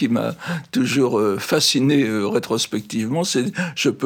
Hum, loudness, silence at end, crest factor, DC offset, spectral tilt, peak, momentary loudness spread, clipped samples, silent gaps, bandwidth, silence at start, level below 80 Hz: none; -20 LUFS; 0 s; 14 dB; under 0.1%; -4.5 dB/octave; -6 dBFS; 8 LU; under 0.1%; none; 19.5 kHz; 0 s; -64 dBFS